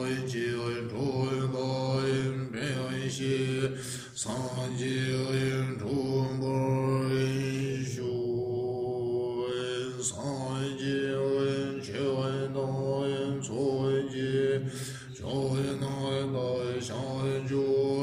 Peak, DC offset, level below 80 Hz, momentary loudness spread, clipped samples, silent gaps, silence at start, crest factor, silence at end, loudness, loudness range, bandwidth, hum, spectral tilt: -16 dBFS; under 0.1%; -62 dBFS; 5 LU; under 0.1%; none; 0 s; 14 dB; 0 s; -31 LUFS; 2 LU; 14 kHz; none; -6 dB/octave